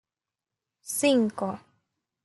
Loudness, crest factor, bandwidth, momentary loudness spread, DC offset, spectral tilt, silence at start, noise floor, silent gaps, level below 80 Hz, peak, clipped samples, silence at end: -26 LUFS; 20 dB; 12 kHz; 19 LU; under 0.1%; -3.5 dB/octave; 0.85 s; -90 dBFS; none; -78 dBFS; -10 dBFS; under 0.1%; 0.65 s